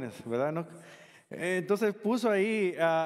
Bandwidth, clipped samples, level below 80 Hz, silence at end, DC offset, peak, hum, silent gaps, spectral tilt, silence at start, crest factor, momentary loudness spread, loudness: 15 kHz; under 0.1%; -82 dBFS; 0 s; under 0.1%; -12 dBFS; none; none; -6 dB/octave; 0 s; 18 dB; 15 LU; -30 LUFS